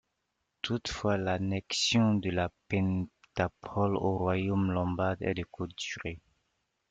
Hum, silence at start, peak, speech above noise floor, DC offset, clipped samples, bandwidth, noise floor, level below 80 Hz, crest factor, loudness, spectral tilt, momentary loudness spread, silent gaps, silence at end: none; 0.65 s; -14 dBFS; 51 dB; under 0.1%; under 0.1%; 9.2 kHz; -82 dBFS; -58 dBFS; 16 dB; -31 LUFS; -5.5 dB/octave; 10 LU; none; 0.7 s